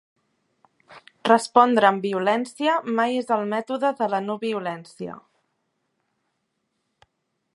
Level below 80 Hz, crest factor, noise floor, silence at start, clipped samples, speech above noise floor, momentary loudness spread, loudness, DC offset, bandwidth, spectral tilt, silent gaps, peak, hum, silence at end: -76 dBFS; 24 dB; -76 dBFS; 0.9 s; under 0.1%; 53 dB; 15 LU; -22 LUFS; under 0.1%; 11.5 kHz; -5 dB/octave; none; -2 dBFS; none; 2.35 s